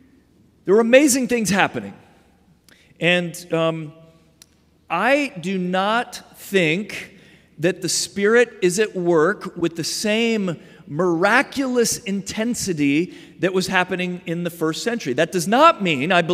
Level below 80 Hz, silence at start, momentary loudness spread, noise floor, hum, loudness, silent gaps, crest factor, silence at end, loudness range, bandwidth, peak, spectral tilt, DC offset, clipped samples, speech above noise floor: -60 dBFS; 0.65 s; 12 LU; -55 dBFS; none; -19 LUFS; none; 20 dB; 0 s; 4 LU; 16 kHz; 0 dBFS; -4 dB/octave; under 0.1%; under 0.1%; 36 dB